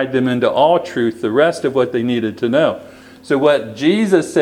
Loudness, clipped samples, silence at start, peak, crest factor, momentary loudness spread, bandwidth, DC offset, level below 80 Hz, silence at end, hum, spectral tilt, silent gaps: -16 LUFS; under 0.1%; 0 s; 0 dBFS; 16 dB; 5 LU; 14 kHz; under 0.1%; -60 dBFS; 0 s; none; -6 dB/octave; none